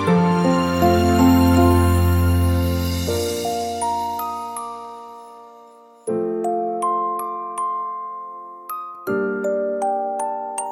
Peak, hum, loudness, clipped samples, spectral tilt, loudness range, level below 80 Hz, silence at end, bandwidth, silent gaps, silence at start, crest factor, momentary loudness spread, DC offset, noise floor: -4 dBFS; none; -20 LUFS; under 0.1%; -6.5 dB/octave; 9 LU; -34 dBFS; 0 s; 16.5 kHz; none; 0 s; 16 dB; 17 LU; under 0.1%; -46 dBFS